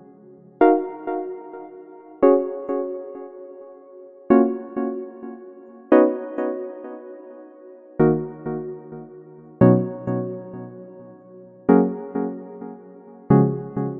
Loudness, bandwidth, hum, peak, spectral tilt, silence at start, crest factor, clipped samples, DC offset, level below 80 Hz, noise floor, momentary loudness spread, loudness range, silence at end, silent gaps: -21 LUFS; 3.7 kHz; none; -2 dBFS; -12.5 dB/octave; 0.6 s; 22 dB; under 0.1%; under 0.1%; -60 dBFS; -47 dBFS; 23 LU; 3 LU; 0 s; none